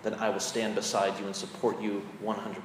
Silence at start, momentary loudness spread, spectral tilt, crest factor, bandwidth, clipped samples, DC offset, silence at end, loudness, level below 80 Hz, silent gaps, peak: 0 s; 7 LU; -3.5 dB/octave; 18 dB; 15.5 kHz; under 0.1%; under 0.1%; 0 s; -31 LUFS; -76 dBFS; none; -14 dBFS